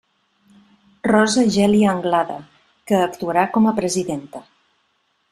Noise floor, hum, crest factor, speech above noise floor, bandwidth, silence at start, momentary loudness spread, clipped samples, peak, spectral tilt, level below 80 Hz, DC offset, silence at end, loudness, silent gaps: -66 dBFS; none; 18 dB; 49 dB; 13.5 kHz; 1.05 s; 13 LU; under 0.1%; -2 dBFS; -5 dB/octave; -56 dBFS; under 0.1%; 0.9 s; -18 LUFS; none